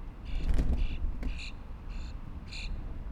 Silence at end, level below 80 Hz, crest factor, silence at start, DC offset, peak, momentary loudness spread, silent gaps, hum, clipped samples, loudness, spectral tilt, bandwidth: 0 s; -34 dBFS; 18 dB; 0 s; under 0.1%; -14 dBFS; 11 LU; none; none; under 0.1%; -38 LUFS; -6 dB/octave; 8.4 kHz